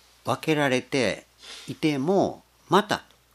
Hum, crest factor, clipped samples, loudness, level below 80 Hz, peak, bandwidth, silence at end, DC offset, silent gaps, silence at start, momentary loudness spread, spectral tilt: none; 20 dB; under 0.1%; -25 LUFS; -64 dBFS; -6 dBFS; 14.5 kHz; 0.35 s; under 0.1%; none; 0.25 s; 14 LU; -5 dB/octave